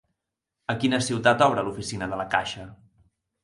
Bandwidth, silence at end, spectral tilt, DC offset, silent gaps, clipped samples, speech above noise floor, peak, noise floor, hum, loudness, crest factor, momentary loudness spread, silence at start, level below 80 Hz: 11.5 kHz; 0.7 s; -4.5 dB/octave; under 0.1%; none; under 0.1%; 60 dB; -4 dBFS; -84 dBFS; none; -24 LUFS; 22 dB; 16 LU; 0.7 s; -56 dBFS